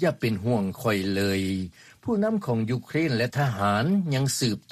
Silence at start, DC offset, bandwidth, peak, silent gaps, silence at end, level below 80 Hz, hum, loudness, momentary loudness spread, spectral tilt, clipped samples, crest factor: 0 s; under 0.1%; 15.5 kHz; -12 dBFS; none; 0.15 s; -58 dBFS; none; -26 LUFS; 5 LU; -5.5 dB/octave; under 0.1%; 14 dB